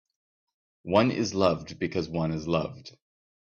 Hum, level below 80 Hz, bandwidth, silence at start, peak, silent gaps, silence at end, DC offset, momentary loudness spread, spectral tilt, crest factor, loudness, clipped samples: none; -58 dBFS; 7.8 kHz; 0.85 s; -8 dBFS; none; 0.6 s; under 0.1%; 12 LU; -6 dB/octave; 22 dB; -27 LUFS; under 0.1%